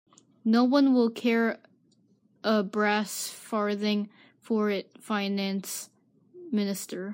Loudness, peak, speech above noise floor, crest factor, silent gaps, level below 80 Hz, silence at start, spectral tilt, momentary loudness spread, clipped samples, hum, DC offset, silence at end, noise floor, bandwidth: -27 LUFS; -12 dBFS; 39 dB; 16 dB; none; -84 dBFS; 0.45 s; -4.5 dB/octave; 12 LU; under 0.1%; none; under 0.1%; 0 s; -65 dBFS; 16 kHz